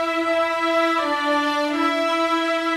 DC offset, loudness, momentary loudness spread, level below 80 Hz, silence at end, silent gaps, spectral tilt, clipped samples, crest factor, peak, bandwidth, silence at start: under 0.1%; -20 LUFS; 1 LU; -62 dBFS; 0 s; none; -2 dB/octave; under 0.1%; 12 dB; -8 dBFS; 16 kHz; 0 s